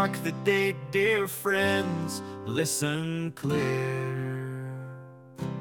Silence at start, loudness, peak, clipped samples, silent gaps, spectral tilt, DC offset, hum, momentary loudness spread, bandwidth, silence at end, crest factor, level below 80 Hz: 0 s; -28 LUFS; -12 dBFS; under 0.1%; none; -4.5 dB/octave; under 0.1%; none; 13 LU; 18 kHz; 0 s; 18 dB; -68 dBFS